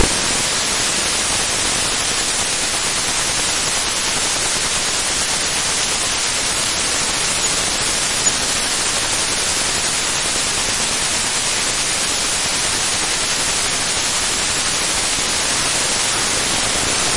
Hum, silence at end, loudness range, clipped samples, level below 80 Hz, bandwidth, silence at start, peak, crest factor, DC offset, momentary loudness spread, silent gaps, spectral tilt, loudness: none; 0 s; 0 LU; under 0.1%; -38 dBFS; 11.5 kHz; 0 s; -2 dBFS; 16 dB; under 0.1%; 1 LU; none; -0.5 dB/octave; -16 LUFS